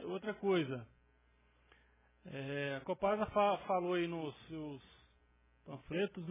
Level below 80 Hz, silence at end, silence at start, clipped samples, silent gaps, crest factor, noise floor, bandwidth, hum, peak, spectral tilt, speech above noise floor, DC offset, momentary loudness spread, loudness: -68 dBFS; 0 s; 0 s; under 0.1%; none; 20 dB; -71 dBFS; 3.8 kHz; none; -20 dBFS; -4.5 dB/octave; 33 dB; under 0.1%; 15 LU; -38 LUFS